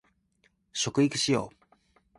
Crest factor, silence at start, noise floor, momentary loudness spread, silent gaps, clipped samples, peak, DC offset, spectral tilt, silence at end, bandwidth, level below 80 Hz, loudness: 18 dB; 0.75 s; -70 dBFS; 13 LU; none; under 0.1%; -12 dBFS; under 0.1%; -4 dB/octave; 0.7 s; 11.5 kHz; -64 dBFS; -28 LUFS